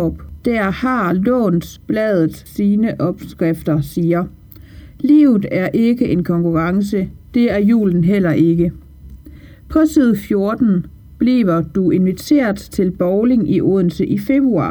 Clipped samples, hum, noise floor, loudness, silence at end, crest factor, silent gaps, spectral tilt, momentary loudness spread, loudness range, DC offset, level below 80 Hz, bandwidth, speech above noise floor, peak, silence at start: under 0.1%; none; -38 dBFS; -16 LUFS; 0 s; 14 dB; none; -8 dB/octave; 7 LU; 2 LU; under 0.1%; -40 dBFS; over 20 kHz; 24 dB; -2 dBFS; 0 s